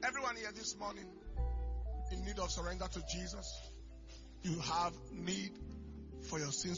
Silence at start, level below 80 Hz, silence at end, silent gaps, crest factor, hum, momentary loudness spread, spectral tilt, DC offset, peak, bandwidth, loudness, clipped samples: 0 s; -46 dBFS; 0 s; none; 18 dB; none; 13 LU; -3.5 dB/octave; under 0.1%; -24 dBFS; 7.4 kHz; -42 LUFS; under 0.1%